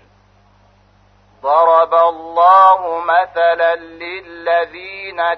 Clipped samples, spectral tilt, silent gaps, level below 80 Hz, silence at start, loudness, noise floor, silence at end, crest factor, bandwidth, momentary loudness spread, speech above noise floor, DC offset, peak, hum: under 0.1%; -4.5 dB/octave; none; -58 dBFS; 1.45 s; -13 LUFS; -51 dBFS; 0 s; 14 dB; 6 kHz; 18 LU; 38 dB; under 0.1%; 0 dBFS; 50 Hz at -60 dBFS